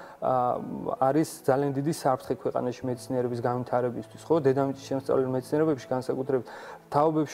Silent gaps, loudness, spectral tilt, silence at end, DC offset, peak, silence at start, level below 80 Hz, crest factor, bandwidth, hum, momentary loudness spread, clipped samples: none; -28 LUFS; -7 dB/octave; 0 s; under 0.1%; -10 dBFS; 0 s; -64 dBFS; 18 dB; 16 kHz; none; 7 LU; under 0.1%